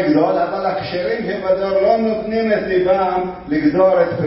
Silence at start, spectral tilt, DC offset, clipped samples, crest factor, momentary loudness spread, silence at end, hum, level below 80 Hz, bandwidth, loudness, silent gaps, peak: 0 s; -11 dB/octave; under 0.1%; under 0.1%; 14 dB; 7 LU; 0 s; none; -46 dBFS; 5.8 kHz; -17 LUFS; none; -2 dBFS